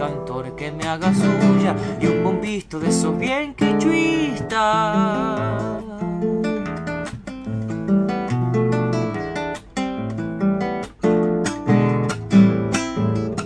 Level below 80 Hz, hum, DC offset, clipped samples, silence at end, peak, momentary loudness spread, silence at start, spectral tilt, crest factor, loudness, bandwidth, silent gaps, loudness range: -46 dBFS; none; under 0.1%; under 0.1%; 0 s; -4 dBFS; 11 LU; 0 s; -6.5 dB/octave; 16 dB; -21 LUFS; 11 kHz; none; 4 LU